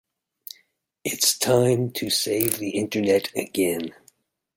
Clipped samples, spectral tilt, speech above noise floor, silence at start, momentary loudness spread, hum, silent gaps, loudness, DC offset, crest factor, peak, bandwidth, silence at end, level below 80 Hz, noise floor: under 0.1%; -3.5 dB/octave; 42 dB; 1.05 s; 19 LU; none; none; -23 LUFS; under 0.1%; 20 dB; -4 dBFS; 17 kHz; 0.65 s; -64 dBFS; -65 dBFS